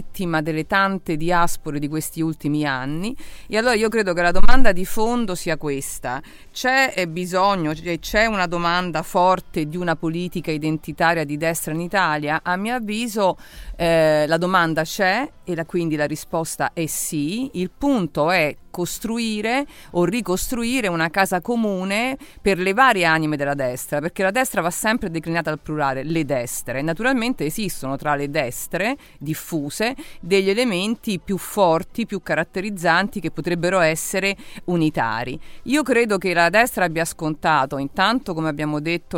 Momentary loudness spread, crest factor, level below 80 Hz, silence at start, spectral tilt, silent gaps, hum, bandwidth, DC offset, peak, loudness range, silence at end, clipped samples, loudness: 8 LU; 20 dB; -34 dBFS; 0 s; -4.5 dB/octave; none; none; 17 kHz; under 0.1%; 0 dBFS; 3 LU; 0 s; under 0.1%; -21 LUFS